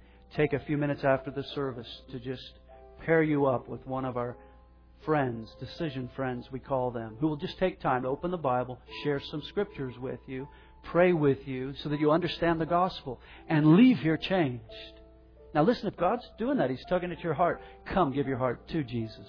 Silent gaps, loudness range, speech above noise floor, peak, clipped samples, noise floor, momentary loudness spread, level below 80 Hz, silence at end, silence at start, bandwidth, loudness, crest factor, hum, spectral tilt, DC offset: none; 7 LU; 27 dB; -10 dBFS; under 0.1%; -56 dBFS; 15 LU; -54 dBFS; 0 s; 0.35 s; 5.4 kHz; -29 LUFS; 20 dB; none; -9 dB/octave; under 0.1%